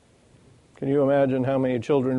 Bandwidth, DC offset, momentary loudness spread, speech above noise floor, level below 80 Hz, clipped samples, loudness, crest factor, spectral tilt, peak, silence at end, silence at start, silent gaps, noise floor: 9.6 kHz; under 0.1%; 5 LU; 34 dB; -60 dBFS; under 0.1%; -23 LUFS; 14 dB; -8.5 dB/octave; -10 dBFS; 0 s; 0.8 s; none; -56 dBFS